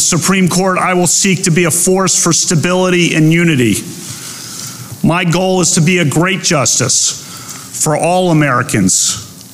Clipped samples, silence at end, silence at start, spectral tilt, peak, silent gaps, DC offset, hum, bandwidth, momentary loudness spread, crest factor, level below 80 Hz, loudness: under 0.1%; 0 s; 0 s; -3.5 dB/octave; -2 dBFS; none; under 0.1%; none; 16 kHz; 14 LU; 10 dB; -44 dBFS; -11 LUFS